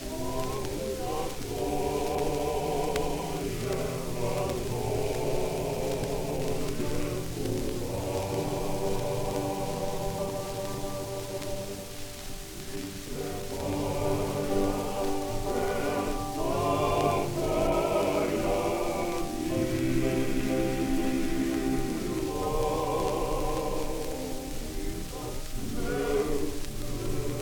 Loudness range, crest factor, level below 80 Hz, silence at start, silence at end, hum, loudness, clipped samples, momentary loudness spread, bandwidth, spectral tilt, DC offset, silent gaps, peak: 6 LU; 18 dB; -38 dBFS; 0 s; 0 s; none; -31 LUFS; under 0.1%; 9 LU; 19 kHz; -5.5 dB/octave; under 0.1%; none; -12 dBFS